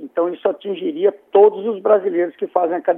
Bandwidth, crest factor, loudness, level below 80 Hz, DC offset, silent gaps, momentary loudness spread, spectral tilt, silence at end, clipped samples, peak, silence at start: 3.7 kHz; 16 dB; -18 LUFS; -84 dBFS; under 0.1%; none; 9 LU; -9 dB/octave; 0 s; under 0.1%; -2 dBFS; 0 s